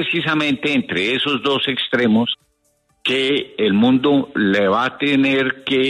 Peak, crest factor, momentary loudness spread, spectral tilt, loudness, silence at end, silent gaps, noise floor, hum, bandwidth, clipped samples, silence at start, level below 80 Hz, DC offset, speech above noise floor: -4 dBFS; 14 dB; 4 LU; -5.5 dB/octave; -17 LUFS; 0 s; none; -63 dBFS; none; 10.5 kHz; under 0.1%; 0 s; -60 dBFS; under 0.1%; 46 dB